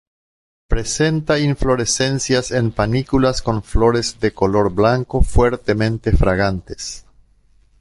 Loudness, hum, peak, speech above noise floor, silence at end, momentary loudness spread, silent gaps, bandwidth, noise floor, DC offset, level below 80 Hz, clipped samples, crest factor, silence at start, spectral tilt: -18 LUFS; none; -2 dBFS; 37 dB; 0.8 s; 7 LU; none; 11.5 kHz; -54 dBFS; under 0.1%; -26 dBFS; under 0.1%; 16 dB; 0.7 s; -5 dB/octave